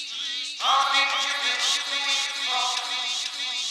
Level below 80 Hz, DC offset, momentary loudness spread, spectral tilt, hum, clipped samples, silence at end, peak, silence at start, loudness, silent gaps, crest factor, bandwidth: -84 dBFS; under 0.1%; 7 LU; 3 dB/octave; none; under 0.1%; 0 s; -8 dBFS; 0 s; -23 LUFS; none; 16 dB; 18 kHz